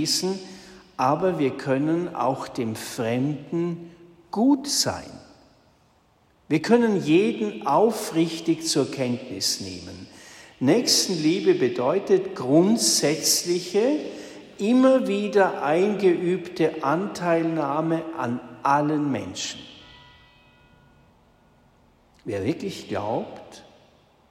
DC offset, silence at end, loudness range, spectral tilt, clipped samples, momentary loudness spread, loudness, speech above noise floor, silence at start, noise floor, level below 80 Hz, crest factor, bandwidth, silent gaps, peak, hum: under 0.1%; 0.7 s; 12 LU; -4 dB/octave; under 0.1%; 14 LU; -23 LUFS; 38 dB; 0 s; -61 dBFS; -64 dBFS; 18 dB; 16 kHz; none; -6 dBFS; none